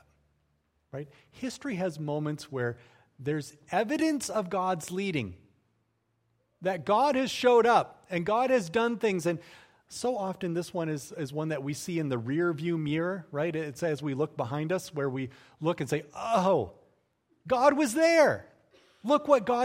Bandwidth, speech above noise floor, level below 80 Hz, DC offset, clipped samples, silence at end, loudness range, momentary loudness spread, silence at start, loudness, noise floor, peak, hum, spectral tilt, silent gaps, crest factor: 16 kHz; 46 dB; -68 dBFS; under 0.1%; under 0.1%; 0 s; 6 LU; 13 LU; 0.95 s; -29 LUFS; -75 dBFS; -8 dBFS; none; -5.5 dB/octave; none; 20 dB